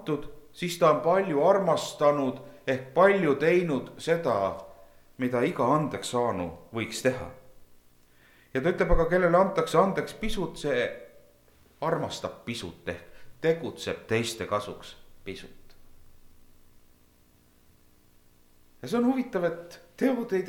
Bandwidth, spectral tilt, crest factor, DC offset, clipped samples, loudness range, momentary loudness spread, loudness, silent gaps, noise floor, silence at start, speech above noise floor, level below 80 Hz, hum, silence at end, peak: 18 kHz; -5.5 dB/octave; 20 dB; under 0.1%; under 0.1%; 9 LU; 18 LU; -27 LUFS; none; -61 dBFS; 0 s; 34 dB; -44 dBFS; 60 Hz at -60 dBFS; 0 s; -8 dBFS